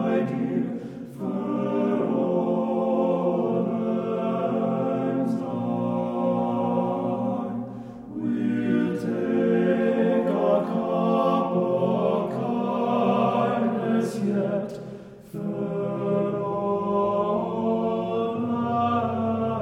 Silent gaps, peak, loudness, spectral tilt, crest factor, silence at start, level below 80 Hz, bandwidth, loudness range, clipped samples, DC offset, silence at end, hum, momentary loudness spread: none; -10 dBFS; -25 LUFS; -8.5 dB/octave; 14 dB; 0 s; -62 dBFS; 11 kHz; 4 LU; under 0.1%; under 0.1%; 0 s; none; 8 LU